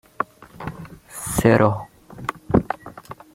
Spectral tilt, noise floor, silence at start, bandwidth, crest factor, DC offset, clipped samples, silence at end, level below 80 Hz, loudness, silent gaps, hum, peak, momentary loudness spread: -6 dB/octave; -40 dBFS; 0.2 s; 16.5 kHz; 22 dB; under 0.1%; under 0.1%; 0.2 s; -44 dBFS; -22 LUFS; none; none; 0 dBFS; 23 LU